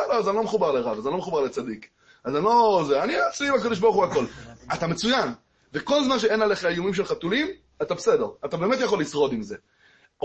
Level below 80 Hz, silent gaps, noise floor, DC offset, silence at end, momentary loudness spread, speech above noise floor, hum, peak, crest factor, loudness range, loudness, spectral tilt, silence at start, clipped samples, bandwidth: -58 dBFS; none; -59 dBFS; under 0.1%; 0.65 s; 12 LU; 36 dB; none; -8 dBFS; 16 dB; 2 LU; -24 LUFS; -4.5 dB/octave; 0 s; under 0.1%; 8.6 kHz